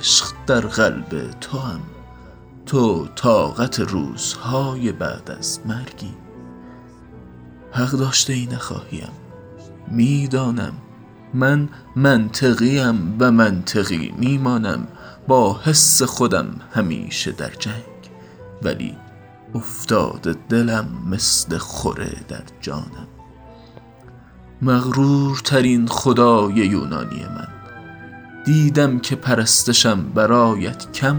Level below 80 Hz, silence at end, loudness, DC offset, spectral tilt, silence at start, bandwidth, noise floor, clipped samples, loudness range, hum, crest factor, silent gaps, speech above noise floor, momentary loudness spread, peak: -48 dBFS; 0 s; -18 LUFS; under 0.1%; -4 dB/octave; 0 s; over 20 kHz; -43 dBFS; under 0.1%; 8 LU; none; 18 dB; none; 25 dB; 18 LU; 0 dBFS